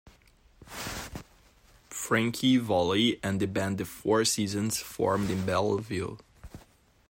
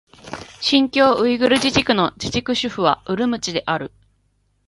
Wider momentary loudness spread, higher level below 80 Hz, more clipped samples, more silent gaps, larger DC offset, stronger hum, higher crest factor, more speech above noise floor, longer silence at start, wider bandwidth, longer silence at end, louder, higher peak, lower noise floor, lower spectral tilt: about the same, 14 LU vs 12 LU; second, -56 dBFS vs -48 dBFS; neither; neither; neither; neither; about the same, 18 dB vs 20 dB; second, 33 dB vs 46 dB; first, 0.6 s vs 0.25 s; first, 16.5 kHz vs 11.5 kHz; second, 0.55 s vs 0.8 s; second, -28 LUFS vs -18 LUFS; second, -12 dBFS vs 0 dBFS; second, -60 dBFS vs -64 dBFS; about the same, -4.5 dB/octave vs -4 dB/octave